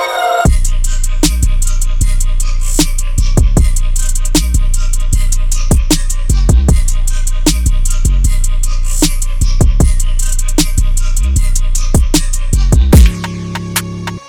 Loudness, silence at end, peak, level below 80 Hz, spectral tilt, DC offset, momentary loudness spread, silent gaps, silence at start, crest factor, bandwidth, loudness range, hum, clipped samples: -14 LUFS; 0.1 s; 0 dBFS; -10 dBFS; -4.5 dB/octave; under 0.1%; 6 LU; none; 0 s; 10 dB; 18 kHz; 2 LU; none; 0.2%